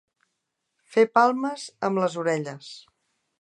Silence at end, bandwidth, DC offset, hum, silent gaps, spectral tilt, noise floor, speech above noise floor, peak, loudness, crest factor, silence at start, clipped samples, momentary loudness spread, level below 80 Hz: 0.6 s; 11 kHz; under 0.1%; none; none; -5.5 dB/octave; -79 dBFS; 56 dB; -4 dBFS; -24 LUFS; 22 dB; 0.9 s; under 0.1%; 21 LU; -80 dBFS